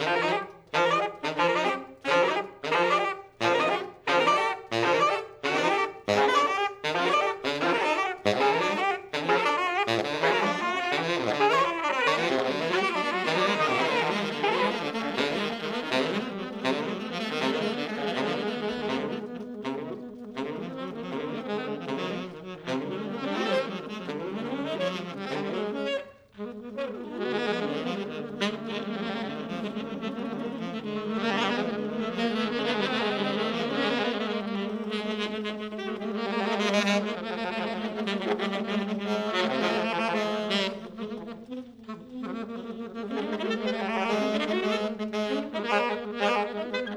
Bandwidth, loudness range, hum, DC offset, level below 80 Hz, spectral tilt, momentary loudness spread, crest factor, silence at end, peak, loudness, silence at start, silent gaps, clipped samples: 13.5 kHz; 7 LU; none; under 0.1%; -68 dBFS; -4.5 dB/octave; 11 LU; 20 dB; 0 s; -8 dBFS; -28 LUFS; 0 s; none; under 0.1%